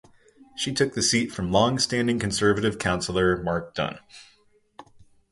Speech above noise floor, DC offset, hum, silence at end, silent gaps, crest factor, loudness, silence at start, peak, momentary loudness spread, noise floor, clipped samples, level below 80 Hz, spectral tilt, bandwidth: 38 dB; under 0.1%; none; 0.3 s; none; 20 dB; -24 LUFS; 0.55 s; -6 dBFS; 9 LU; -62 dBFS; under 0.1%; -48 dBFS; -4 dB/octave; 11.5 kHz